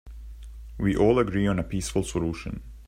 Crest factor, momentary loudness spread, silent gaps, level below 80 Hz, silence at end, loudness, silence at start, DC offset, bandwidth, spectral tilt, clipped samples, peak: 20 dB; 23 LU; none; -40 dBFS; 0 s; -26 LUFS; 0.05 s; under 0.1%; 16 kHz; -6.5 dB/octave; under 0.1%; -8 dBFS